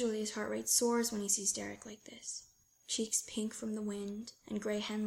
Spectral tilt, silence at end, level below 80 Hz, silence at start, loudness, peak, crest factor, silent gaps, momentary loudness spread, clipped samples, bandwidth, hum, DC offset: -2.5 dB/octave; 0 s; -72 dBFS; 0 s; -35 LUFS; -16 dBFS; 22 dB; none; 16 LU; under 0.1%; 16.5 kHz; none; under 0.1%